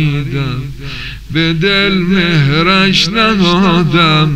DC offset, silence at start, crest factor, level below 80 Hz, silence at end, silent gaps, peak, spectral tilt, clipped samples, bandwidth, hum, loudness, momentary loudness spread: under 0.1%; 0 s; 12 dB; -32 dBFS; 0 s; none; 0 dBFS; -5.5 dB/octave; under 0.1%; 12.5 kHz; none; -10 LUFS; 13 LU